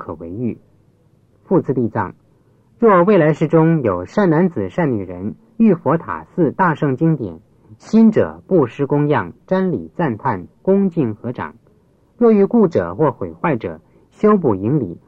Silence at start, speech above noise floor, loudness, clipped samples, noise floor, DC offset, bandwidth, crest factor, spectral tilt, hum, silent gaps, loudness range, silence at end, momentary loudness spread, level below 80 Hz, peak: 0 s; 39 dB; -17 LUFS; under 0.1%; -55 dBFS; under 0.1%; 7.4 kHz; 14 dB; -9.5 dB/octave; none; none; 3 LU; 0.15 s; 13 LU; -54 dBFS; -2 dBFS